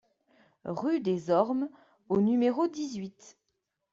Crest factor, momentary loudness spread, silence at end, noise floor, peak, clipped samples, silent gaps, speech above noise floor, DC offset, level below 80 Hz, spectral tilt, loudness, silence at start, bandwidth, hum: 20 dB; 13 LU; 0.65 s; -82 dBFS; -10 dBFS; under 0.1%; none; 53 dB; under 0.1%; -72 dBFS; -7 dB/octave; -29 LUFS; 0.65 s; 7.8 kHz; none